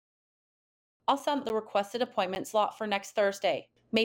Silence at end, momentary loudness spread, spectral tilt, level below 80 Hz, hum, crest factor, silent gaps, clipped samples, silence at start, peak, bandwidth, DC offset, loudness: 0 s; 4 LU; -3.5 dB/octave; -72 dBFS; none; 20 dB; none; under 0.1%; 1.1 s; -12 dBFS; 18 kHz; under 0.1%; -31 LUFS